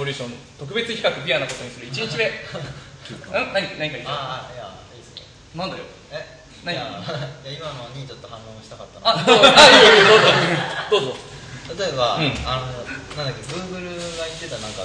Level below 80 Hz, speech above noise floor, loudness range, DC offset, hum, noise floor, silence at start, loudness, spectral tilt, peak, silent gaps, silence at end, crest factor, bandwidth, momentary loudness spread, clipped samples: -48 dBFS; 23 dB; 19 LU; under 0.1%; none; -42 dBFS; 0 s; -16 LUFS; -3 dB/octave; 0 dBFS; none; 0 s; 20 dB; 11 kHz; 26 LU; under 0.1%